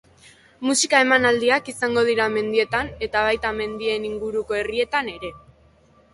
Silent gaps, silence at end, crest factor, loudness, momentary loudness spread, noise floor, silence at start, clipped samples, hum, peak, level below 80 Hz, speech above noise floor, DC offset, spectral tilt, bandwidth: none; 0.75 s; 20 dB; -21 LUFS; 10 LU; -55 dBFS; 0.6 s; under 0.1%; none; -2 dBFS; -50 dBFS; 34 dB; under 0.1%; -2.5 dB/octave; 11.5 kHz